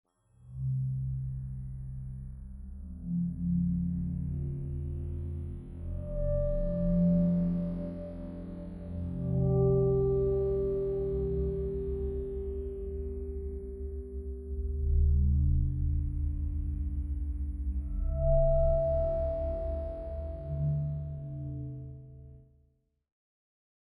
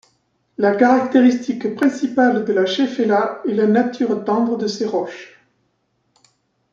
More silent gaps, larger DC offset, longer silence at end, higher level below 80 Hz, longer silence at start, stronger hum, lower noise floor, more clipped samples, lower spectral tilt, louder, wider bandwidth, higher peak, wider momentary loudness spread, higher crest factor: neither; neither; about the same, 1.45 s vs 1.45 s; first, -36 dBFS vs -68 dBFS; second, 0.4 s vs 0.6 s; neither; about the same, -70 dBFS vs -67 dBFS; neither; first, -13 dB/octave vs -6 dB/octave; second, -33 LUFS vs -17 LUFS; second, 2.2 kHz vs 7.4 kHz; second, -16 dBFS vs -2 dBFS; first, 15 LU vs 8 LU; about the same, 16 dB vs 16 dB